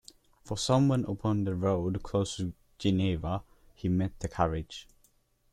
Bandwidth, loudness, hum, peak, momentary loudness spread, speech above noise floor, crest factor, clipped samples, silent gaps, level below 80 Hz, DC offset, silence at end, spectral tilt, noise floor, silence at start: 12.5 kHz; -31 LUFS; none; -12 dBFS; 12 LU; 39 dB; 20 dB; under 0.1%; none; -50 dBFS; under 0.1%; 0.7 s; -6.5 dB/octave; -68 dBFS; 0.45 s